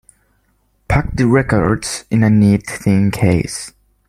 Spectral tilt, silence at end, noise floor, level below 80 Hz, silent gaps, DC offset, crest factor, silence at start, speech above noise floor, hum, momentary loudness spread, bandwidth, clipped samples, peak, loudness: -6.5 dB/octave; 0.4 s; -60 dBFS; -34 dBFS; none; under 0.1%; 16 dB; 0.9 s; 46 dB; none; 8 LU; 14.5 kHz; under 0.1%; 0 dBFS; -15 LUFS